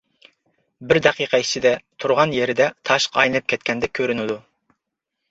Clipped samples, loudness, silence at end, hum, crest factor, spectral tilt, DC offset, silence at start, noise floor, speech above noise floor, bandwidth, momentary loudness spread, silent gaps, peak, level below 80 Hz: under 0.1%; -19 LUFS; 0.9 s; none; 20 dB; -3.5 dB/octave; under 0.1%; 0.8 s; -80 dBFS; 60 dB; 8 kHz; 6 LU; none; -2 dBFS; -56 dBFS